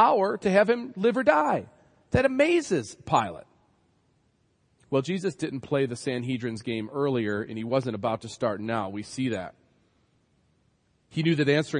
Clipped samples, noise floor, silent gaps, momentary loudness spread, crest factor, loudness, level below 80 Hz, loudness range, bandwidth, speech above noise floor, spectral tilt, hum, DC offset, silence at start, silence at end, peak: under 0.1%; -68 dBFS; none; 10 LU; 20 dB; -27 LUFS; -60 dBFS; 7 LU; 10.5 kHz; 43 dB; -6 dB/octave; none; under 0.1%; 0 s; 0 s; -8 dBFS